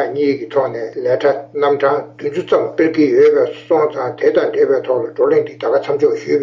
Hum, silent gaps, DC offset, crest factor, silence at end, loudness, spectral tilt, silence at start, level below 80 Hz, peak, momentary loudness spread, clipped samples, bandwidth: none; none; under 0.1%; 12 dB; 0 s; -15 LUFS; -7 dB/octave; 0 s; -62 dBFS; -2 dBFS; 6 LU; under 0.1%; 7.2 kHz